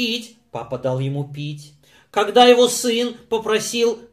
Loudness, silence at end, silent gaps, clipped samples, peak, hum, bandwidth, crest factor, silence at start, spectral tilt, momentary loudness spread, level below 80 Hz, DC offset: -18 LUFS; 0.1 s; none; under 0.1%; 0 dBFS; none; 15.5 kHz; 20 dB; 0 s; -4 dB/octave; 19 LU; -60 dBFS; under 0.1%